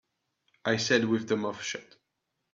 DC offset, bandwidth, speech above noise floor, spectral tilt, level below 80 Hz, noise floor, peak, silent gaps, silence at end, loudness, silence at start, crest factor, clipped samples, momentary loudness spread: under 0.1%; 7.8 kHz; 53 dB; -4 dB/octave; -70 dBFS; -82 dBFS; -8 dBFS; none; 0.7 s; -29 LUFS; 0.65 s; 22 dB; under 0.1%; 11 LU